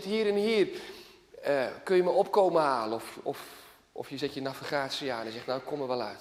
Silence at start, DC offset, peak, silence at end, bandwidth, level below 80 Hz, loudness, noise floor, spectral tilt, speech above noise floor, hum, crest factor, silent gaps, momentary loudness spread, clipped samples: 0 s; under 0.1%; -12 dBFS; 0 s; 15.5 kHz; -72 dBFS; -30 LUFS; -49 dBFS; -5 dB/octave; 20 dB; none; 18 dB; none; 17 LU; under 0.1%